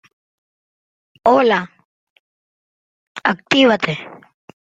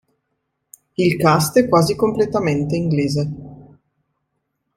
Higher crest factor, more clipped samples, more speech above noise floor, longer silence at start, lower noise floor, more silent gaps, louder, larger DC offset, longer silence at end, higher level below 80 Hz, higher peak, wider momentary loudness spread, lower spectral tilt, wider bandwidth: about the same, 20 dB vs 18 dB; neither; first, over 75 dB vs 57 dB; first, 1.25 s vs 1 s; first, under -90 dBFS vs -74 dBFS; first, 1.85-3.15 s vs none; about the same, -16 LUFS vs -17 LUFS; neither; second, 0.5 s vs 1.15 s; second, -62 dBFS vs -50 dBFS; about the same, -2 dBFS vs -2 dBFS; first, 22 LU vs 10 LU; about the same, -5 dB/octave vs -6 dB/octave; second, 7.8 kHz vs 16 kHz